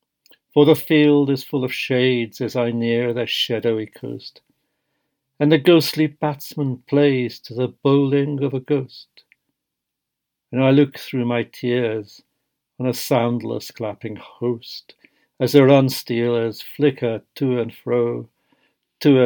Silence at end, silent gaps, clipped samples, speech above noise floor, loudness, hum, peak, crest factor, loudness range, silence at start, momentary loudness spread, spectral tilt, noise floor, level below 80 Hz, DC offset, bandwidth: 0 s; none; under 0.1%; 62 dB; -19 LUFS; none; 0 dBFS; 20 dB; 5 LU; 0.55 s; 14 LU; -6.5 dB/octave; -81 dBFS; -72 dBFS; under 0.1%; 19 kHz